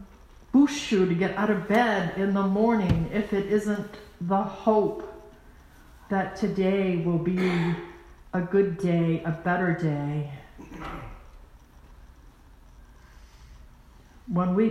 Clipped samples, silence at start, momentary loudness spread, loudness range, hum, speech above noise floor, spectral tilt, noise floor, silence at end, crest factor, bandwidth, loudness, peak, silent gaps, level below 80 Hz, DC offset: under 0.1%; 0 s; 16 LU; 12 LU; none; 27 dB; -7 dB/octave; -52 dBFS; 0 s; 18 dB; 12.5 kHz; -25 LUFS; -8 dBFS; none; -48 dBFS; under 0.1%